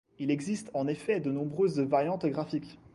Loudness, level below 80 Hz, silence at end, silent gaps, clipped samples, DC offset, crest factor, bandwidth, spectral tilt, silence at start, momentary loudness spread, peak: -31 LUFS; -68 dBFS; 0.2 s; none; under 0.1%; under 0.1%; 18 dB; 11.5 kHz; -7 dB/octave; 0.2 s; 6 LU; -14 dBFS